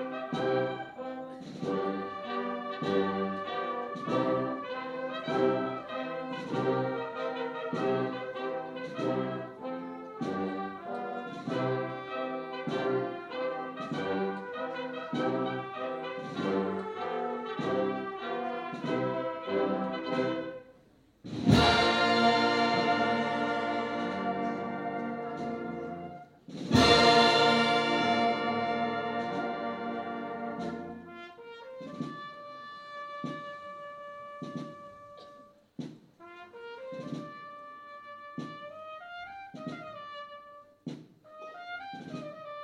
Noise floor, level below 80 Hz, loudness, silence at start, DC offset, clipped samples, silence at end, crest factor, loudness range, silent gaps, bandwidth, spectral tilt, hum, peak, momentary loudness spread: -62 dBFS; -58 dBFS; -31 LUFS; 0 s; under 0.1%; under 0.1%; 0 s; 24 dB; 18 LU; none; 13.5 kHz; -5 dB/octave; none; -8 dBFS; 19 LU